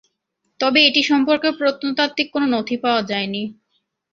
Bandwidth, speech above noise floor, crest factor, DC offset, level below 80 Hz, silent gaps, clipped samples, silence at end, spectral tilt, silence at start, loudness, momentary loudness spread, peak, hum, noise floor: 7.4 kHz; 54 dB; 18 dB; under 0.1%; -64 dBFS; none; under 0.1%; 0.6 s; -4 dB/octave; 0.6 s; -18 LUFS; 10 LU; 0 dBFS; none; -73 dBFS